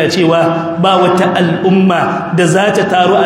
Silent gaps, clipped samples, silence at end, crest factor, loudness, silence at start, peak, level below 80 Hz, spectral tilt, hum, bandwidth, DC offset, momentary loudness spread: none; under 0.1%; 0 s; 10 dB; -11 LUFS; 0 s; 0 dBFS; -52 dBFS; -5.5 dB/octave; none; 13 kHz; under 0.1%; 3 LU